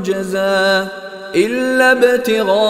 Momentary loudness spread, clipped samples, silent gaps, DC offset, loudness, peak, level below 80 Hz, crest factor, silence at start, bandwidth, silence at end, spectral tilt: 9 LU; under 0.1%; none; under 0.1%; -14 LUFS; 0 dBFS; -54 dBFS; 14 dB; 0 s; 16 kHz; 0 s; -4 dB/octave